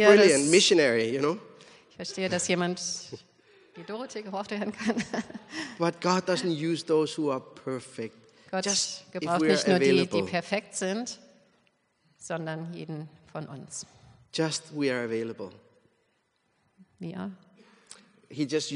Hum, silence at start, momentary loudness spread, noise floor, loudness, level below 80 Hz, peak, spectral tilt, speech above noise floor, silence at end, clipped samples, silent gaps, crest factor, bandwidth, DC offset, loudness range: none; 0 s; 18 LU; -73 dBFS; -27 LUFS; -72 dBFS; -4 dBFS; -4 dB/octave; 46 dB; 0 s; under 0.1%; none; 24 dB; 10.5 kHz; under 0.1%; 10 LU